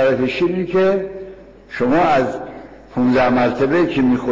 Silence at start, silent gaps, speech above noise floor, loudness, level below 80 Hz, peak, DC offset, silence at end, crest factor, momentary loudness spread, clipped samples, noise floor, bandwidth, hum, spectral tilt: 0 s; none; 21 dB; -17 LUFS; -46 dBFS; -6 dBFS; 0.7%; 0 s; 10 dB; 18 LU; under 0.1%; -37 dBFS; 7.6 kHz; none; -7.5 dB/octave